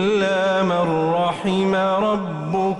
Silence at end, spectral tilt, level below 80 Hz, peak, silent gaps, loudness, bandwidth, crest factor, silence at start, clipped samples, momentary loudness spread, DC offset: 0 s; -6.5 dB/octave; -54 dBFS; -10 dBFS; none; -20 LUFS; 11 kHz; 10 dB; 0 s; under 0.1%; 4 LU; under 0.1%